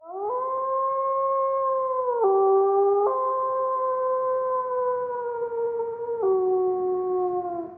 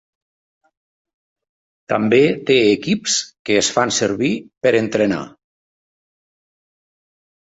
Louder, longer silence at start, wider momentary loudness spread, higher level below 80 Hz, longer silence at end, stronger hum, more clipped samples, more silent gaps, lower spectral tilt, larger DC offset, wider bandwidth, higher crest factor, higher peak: second, -24 LUFS vs -17 LUFS; second, 0 s vs 1.9 s; about the same, 8 LU vs 7 LU; second, -72 dBFS vs -58 dBFS; second, 0 s vs 2.2 s; neither; neither; second, none vs 3.39-3.45 s, 4.57-4.61 s; first, -7.5 dB/octave vs -3.5 dB/octave; neither; second, 2.3 kHz vs 8.2 kHz; second, 12 dB vs 18 dB; second, -12 dBFS vs -2 dBFS